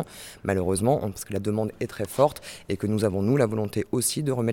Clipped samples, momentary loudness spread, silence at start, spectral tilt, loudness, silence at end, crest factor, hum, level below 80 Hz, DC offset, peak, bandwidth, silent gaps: under 0.1%; 9 LU; 0 s; -5.5 dB/octave; -26 LUFS; 0 s; 20 dB; none; -54 dBFS; under 0.1%; -6 dBFS; 18 kHz; none